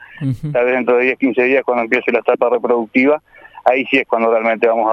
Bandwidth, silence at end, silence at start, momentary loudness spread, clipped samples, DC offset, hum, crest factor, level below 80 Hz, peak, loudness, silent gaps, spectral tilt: 6.6 kHz; 0 s; 0 s; 4 LU; under 0.1%; under 0.1%; none; 16 dB; -56 dBFS; 0 dBFS; -15 LUFS; none; -8 dB/octave